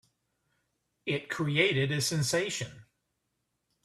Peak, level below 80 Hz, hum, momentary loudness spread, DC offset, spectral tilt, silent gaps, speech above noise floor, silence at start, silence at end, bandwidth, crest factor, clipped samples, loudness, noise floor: -12 dBFS; -66 dBFS; none; 11 LU; under 0.1%; -4 dB/octave; none; 51 dB; 1.05 s; 1.05 s; 14 kHz; 22 dB; under 0.1%; -29 LUFS; -81 dBFS